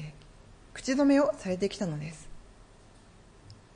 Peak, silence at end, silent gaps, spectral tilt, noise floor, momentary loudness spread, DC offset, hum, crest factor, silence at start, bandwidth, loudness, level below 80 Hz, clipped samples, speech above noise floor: -14 dBFS; 0.2 s; none; -5.5 dB/octave; -55 dBFS; 22 LU; under 0.1%; none; 18 dB; 0 s; 10.5 kHz; -28 LUFS; -56 dBFS; under 0.1%; 28 dB